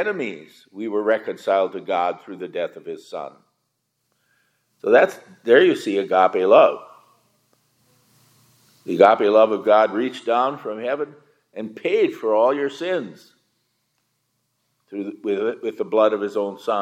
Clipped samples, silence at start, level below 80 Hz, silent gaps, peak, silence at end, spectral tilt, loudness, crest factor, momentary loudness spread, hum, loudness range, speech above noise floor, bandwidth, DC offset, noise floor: under 0.1%; 0 s; -82 dBFS; none; 0 dBFS; 0 s; -5.5 dB/octave; -20 LUFS; 20 dB; 18 LU; none; 9 LU; 54 dB; 12.5 kHz; under 0.1%; -74 dBFS